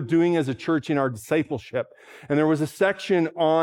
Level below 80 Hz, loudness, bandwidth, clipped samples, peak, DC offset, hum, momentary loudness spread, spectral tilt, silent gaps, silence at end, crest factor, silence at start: -66 dBFS; -24 LUFS; 15.5 kHz; under 0.1%; -6 dBFS; under 0.1%; none; 8 LU; -6.5 dB/octave; none; 0 s; 16 dB; 0 s